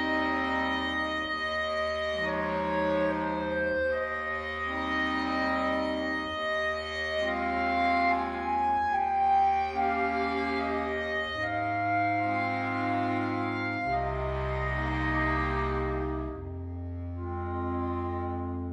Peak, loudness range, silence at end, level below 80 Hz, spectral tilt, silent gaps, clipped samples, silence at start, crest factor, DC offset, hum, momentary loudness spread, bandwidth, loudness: -16 dBFS; 4 LU; 0 s; -44 dBFS; -6.5 dB/octave; none; under 0.1%; 0 s; 14 dB; under 0.1%; none; 6 LU; 11 kHz; -29 LUFS